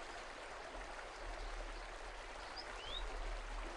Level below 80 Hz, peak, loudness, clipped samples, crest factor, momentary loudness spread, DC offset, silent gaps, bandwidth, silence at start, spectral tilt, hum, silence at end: -50 dBFS; -34 dBFS; -49 LUFS; under 0.1%; 14 dB; 4 LU; under 0.1%; none; 11.5 kHz; 0 s; -3 dB/octave; none; 0 s